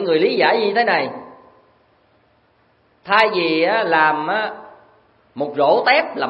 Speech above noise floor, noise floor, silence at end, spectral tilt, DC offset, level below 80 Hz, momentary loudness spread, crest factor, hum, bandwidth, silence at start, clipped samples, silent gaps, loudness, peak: 42 dB; -58 dBFS; 0 s; -6 dB/octave; under 0.1%; -68 dBFS; 13 LU; 20 dB; none; 7.2 kHz; 0 s; under 0.1%; none; -17 LUFS; 0 dBFS